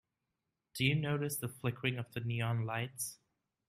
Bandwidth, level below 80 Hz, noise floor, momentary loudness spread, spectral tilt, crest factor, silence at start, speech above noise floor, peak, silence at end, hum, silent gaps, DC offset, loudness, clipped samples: 15.5 kHz; -70 dBFS; -87 dBFS; 8 LU; -4.5 dB/octave; 20 dB; 0.75 s; 51 dB; -18 dBFS; 0.55 s; none; none; under 0.1%; -36 LUFS; under 0.1%